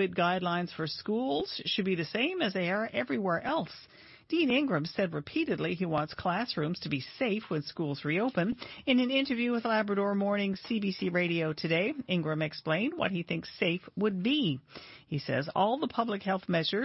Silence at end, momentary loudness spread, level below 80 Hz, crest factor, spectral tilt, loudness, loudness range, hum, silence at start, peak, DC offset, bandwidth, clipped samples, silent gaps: 0 s; 6 LU; -68 dBFS; 16 dB; -8.5 dB/octave; -31 LUFS; 2 LU; none; 0 s; -14 dBFS; under 0.1%; 6 kHz; under 0.1%; none